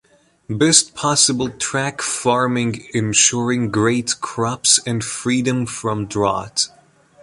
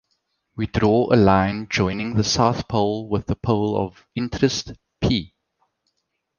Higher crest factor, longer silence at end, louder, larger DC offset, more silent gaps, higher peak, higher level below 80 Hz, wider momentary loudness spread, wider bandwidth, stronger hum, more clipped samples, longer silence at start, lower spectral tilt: about the same, 20 dB vs 20 dB; second, 0.55 s vs 1.15 s; first, -17 LUFS vs -21 LUFS; neither; neither; about the same, 0 dBFS vs -2 dBFS; second, -52 dBFS vs -40 dBFS; second, 9 LU vs 12 LU; first, 11.5 kHz vs 10 kHz; neither; neither; about the same, 0.5 s vs 0.55 s; second, -3 dB/octave vs -5.5 dB/octave